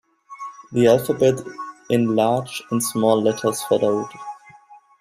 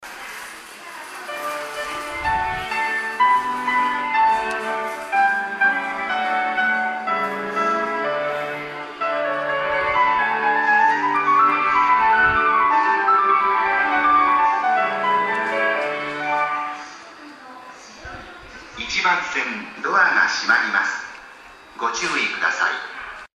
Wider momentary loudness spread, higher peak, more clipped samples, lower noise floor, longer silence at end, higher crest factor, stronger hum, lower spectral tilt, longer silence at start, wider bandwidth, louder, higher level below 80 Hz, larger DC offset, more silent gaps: about the same, 19 LU vs 19 LU; about the same, -2 dBFS vs -4 dBFS; neither; first, -49 dBFS vs -43 dBFS; first, 0.25 s vs 0.1 s; about the same, 18 dB vs 18 dB; neither; first, -5.5 dB/octave vs -2.5 dB/octave; first, 0.3 s vs 0 s; about the same, 15.5 kHz vs 15 kHz; about the same, -20 LUFS vs -19 LUFS; second, -60 dBFS vs -52 dBFS; neither; neither